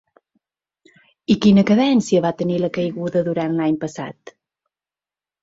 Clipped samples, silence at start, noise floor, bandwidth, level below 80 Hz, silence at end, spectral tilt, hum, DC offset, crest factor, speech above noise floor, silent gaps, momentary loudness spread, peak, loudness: under 0.1%; 1.3 s; under -90 dBFS; 8 kHz; -56 dBFS; 1.3 s; -6.5 dB/octave; none; under 0.1%; 18 dB; over 72 dB; none; 14 LU; -2 dBFS; -18 LUFS